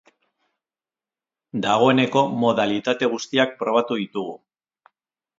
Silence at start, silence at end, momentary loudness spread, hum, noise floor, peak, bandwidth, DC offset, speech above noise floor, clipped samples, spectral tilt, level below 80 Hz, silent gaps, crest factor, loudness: 1.55 s; 1.05 s; 12 LU; none; under -90 dBFS; -2 dBFS; 7.8 kHz; under 0.1%; over 69 dB; under 0.1%; -5 dB/octave; -68 dBFS; none; 20 dB; -21 LUFS